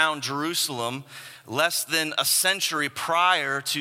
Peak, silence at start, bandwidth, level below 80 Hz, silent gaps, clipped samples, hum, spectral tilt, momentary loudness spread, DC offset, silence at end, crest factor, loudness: -4 dBFS; 0 s; 16.5 kHz; -76 dBFS; none; under 0.1%; none; -1.5 dB/octave; 11 LU; under 0.1%; 0 s; 20 dB; -23 LUFS